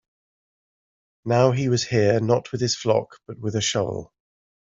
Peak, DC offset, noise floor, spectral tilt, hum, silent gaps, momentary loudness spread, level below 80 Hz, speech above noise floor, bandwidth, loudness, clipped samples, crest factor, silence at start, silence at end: -4 dBFS; under 0.1%; under -90 dBFS; -5 dB/octave; none; none; 13 LU; -60 dBFS; over 68 dB; 7.8 kHz; -22 LUFS; under 0.1%; 20 dB; 1.25 s; 0.65 s